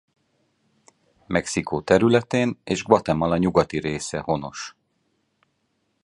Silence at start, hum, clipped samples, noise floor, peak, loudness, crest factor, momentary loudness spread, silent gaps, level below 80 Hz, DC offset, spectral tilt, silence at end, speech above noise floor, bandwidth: 1.3 s; none; under 0.1%; -71 dBFS; -2 dBFS; -22 LUFS; 22 dB; 9 LU; none; -50 dBFS; under 0.1%; -5.5 dB/octave; 1.35 s; 50 dB; 11.5 kHz